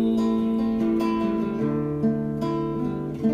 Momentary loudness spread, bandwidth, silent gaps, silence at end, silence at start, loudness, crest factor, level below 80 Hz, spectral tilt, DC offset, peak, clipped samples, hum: 4 LU; 7.4 kHz; none; 0 s; 0 s; -25 LUFS; 12 dB; -48 dBFS; -8.5 dB/octave; under 0.1%; -12 dBFS; under 0.1%; none